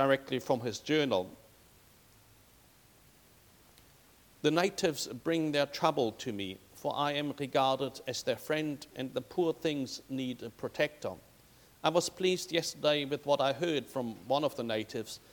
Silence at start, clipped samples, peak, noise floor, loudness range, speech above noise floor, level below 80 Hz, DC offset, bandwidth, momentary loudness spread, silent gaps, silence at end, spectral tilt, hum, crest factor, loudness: 0 s; under 0.1%; -12 dBFS; -62 dBFS; 5 LU; 29 dB; -70 dBFS; under 0.1%; 19 kHz; 10 LU; none; 0.15 s; -4.5 dB/octave; none; 22 dB; -33 LUFS